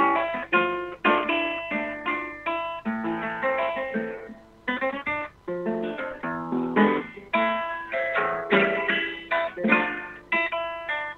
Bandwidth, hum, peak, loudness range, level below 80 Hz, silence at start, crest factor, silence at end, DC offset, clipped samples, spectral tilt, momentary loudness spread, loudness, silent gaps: 6.8 kHz; 50 Hz at -60 dBFS; -6 dBFS; 5 LU; -60 dBFS; 0 s; 20 dB; 0 s; under 0.1%; under 0.1%; -6.5 dB/octave; 9 LU; -26 LUFS; none